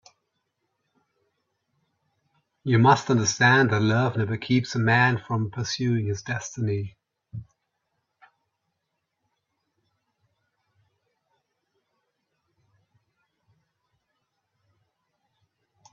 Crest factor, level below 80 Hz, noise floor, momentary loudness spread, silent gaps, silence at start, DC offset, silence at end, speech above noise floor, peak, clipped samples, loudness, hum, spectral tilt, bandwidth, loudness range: 24 dB; -64 dBFS; -80 dBFS; 17 LU; none; 2.65 s; under 0.1%; 8.5 s; 57 dB; -4 dBFS; under 0.1%; -23 LUFS; none; -5 dB/octave; 7.4 kHz; 13 LU